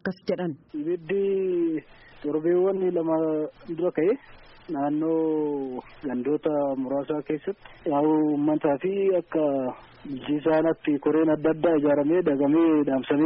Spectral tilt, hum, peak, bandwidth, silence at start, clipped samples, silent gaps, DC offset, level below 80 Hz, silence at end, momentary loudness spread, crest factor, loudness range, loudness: -6.5 dB/octave; none; -10 dBFS; 5.6 kHz; 0.05 s; under 0.1%; none; under 0.1%; -60 dBFS; 0 s; 11 LU; 14 dB; 4 LU; -25 LUFS